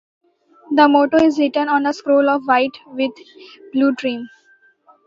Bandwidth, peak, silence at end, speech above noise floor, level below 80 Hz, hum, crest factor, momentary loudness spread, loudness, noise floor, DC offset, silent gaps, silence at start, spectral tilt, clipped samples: 7.6 kHz; 0 dBFS; 0.8 s; 38 dB; -62 dBFS; none; 18 dB; 11 LU; -17 LUFS; -54 dBFS; under 0.1%; none; 0.7 s; -4.5 dB/octave; under 0.1%